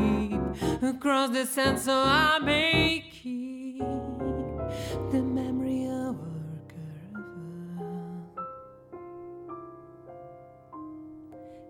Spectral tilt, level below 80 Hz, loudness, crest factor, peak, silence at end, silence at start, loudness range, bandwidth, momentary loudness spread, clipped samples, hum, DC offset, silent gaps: -4.5 dB/octave; -48 dBFS; -28 LUFS; 20 dB; -10 dBFS; 0 s; 0 s; 17 LU; 19 kHz; 24 LU; under 0.1%; none; under 0.1%; none